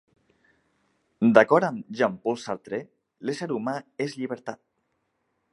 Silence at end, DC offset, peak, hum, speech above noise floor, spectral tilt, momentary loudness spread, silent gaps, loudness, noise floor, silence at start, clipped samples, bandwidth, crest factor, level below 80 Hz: 1 s; under 0.1%; -2 dBFS; none; 50 dB; -6 dB/octave; 17 LU; none; -25 LUFS; -75 dBFS; 1.2 s; under 0.1%; 11.5 kHz; 26 dB; -74 dBFS